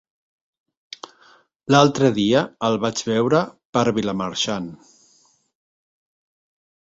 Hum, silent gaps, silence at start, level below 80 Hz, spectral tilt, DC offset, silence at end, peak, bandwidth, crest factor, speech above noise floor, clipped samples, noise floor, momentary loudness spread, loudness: none; 3.65-3.73 s; 1.7 s; -58 dBFS; -5 dB/octave; under 0.1%; 2.2 s; -2 dBFS; 8 kHz; 22 dB; 40 dB; under 0.1%; -59 dBFS; 22 LU; -20 LUFS